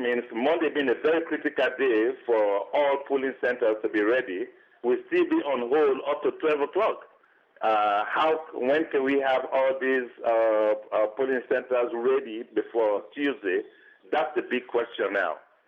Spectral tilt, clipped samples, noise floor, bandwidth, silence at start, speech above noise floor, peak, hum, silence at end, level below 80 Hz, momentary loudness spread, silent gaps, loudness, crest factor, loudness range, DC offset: -6 dB/octave; under 0.1%; -60 dBFS; 6.2 kHz; 0 s; 34 dB; -14 dBFS; none; 0.3 s; -74 dBFS; 6 LU; none; -26 LUFS; 12 dB; 3 LU; under 0.1%